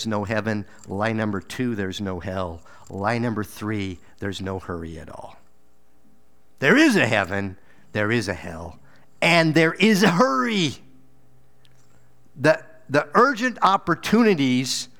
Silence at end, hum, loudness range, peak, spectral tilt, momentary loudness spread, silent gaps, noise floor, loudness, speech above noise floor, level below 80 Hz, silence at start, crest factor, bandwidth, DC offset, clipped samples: 0.15 s; none; 9 LU; -2 dBFS; -5 dB/octave; 17 LU; none; -63 dBFS; -21 LUFS; 41 dB; -54 dBFS; 0 s; 20 dB; 18.5 kHz; 0.6%; under 0.1%